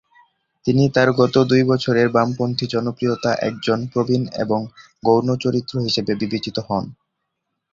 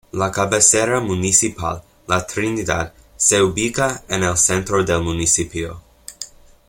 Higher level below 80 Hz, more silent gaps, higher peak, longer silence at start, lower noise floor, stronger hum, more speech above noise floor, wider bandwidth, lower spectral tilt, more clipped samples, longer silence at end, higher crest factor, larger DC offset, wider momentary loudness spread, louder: second, -54 dBFS vs -42 dBFS; neither; about the same, -2 dBFS vs 0 dBFS; first, 0.65 s vs 0.15 s; first, -77 dBFS vs -38 dBFS; neither; first, 58 dB vs 20 dB; second, 7.6 kHz vs 16.5 kHz; first, -6.5 dB/octave vs -3 dB/octave; neither; first, 0.8 s vs 0.4 s; about the same, 18 dB vs 20 dB; neither; second, 9 LU vs 17 LU; about the same, -19 LUFS vs -17 LUFS